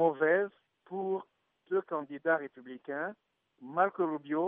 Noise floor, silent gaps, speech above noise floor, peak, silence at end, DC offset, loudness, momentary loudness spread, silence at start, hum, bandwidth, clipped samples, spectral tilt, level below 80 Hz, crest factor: -62 dBFS; none; 29 dB; -14 dBFS; 0 s; under 0.1%; -33 LUFS; 13 LU; 0 s; none; 3.7 kHz; under 0.1%; -5 dB/octave; under -90 dBFS; 20 dB